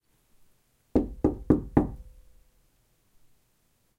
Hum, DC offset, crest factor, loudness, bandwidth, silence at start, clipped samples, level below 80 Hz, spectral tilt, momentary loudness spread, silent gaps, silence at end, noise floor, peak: none; under 0.1%; 24 dB; -27 LUFS; 7.6 kHz; 0.95 s; under 0.1%; -44 dBFS; -10.5 dB/octave; 9 LU; none; 1.9 s; -69 dBFS; -6 dBFS